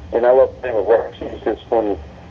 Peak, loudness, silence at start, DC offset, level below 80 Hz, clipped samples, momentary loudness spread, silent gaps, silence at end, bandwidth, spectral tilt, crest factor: -2 dBFS; -18 LUFS; 0 s; under 0.1%; -42 dBFS; under 0.1%; 12 LU; none; 0 s; 6.4 kHz; -8 dB/octave; 16 dB